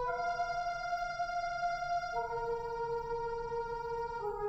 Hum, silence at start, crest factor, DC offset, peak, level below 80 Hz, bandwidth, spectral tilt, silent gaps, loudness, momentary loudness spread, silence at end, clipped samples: none; 0 s; 12 dB; under 0.1%; -24 dBFS; -54 dBFS; 8.2 kHz; -4 dB/octave; none; -37 LUFS; 3 LU; 0 s; under 0.1%